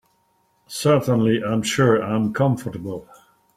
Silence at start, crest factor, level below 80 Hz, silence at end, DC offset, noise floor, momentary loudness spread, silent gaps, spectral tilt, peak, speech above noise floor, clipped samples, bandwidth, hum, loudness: 0.7 s; 18 dB; -56 dBFS; 0.55 s; under 0.1%; -64 dBFS; 14 LU; none; -6 dB/octave; -4 dBFS; 45 dB; under 0.1%; 15.5 kHz; none; -20 LUFS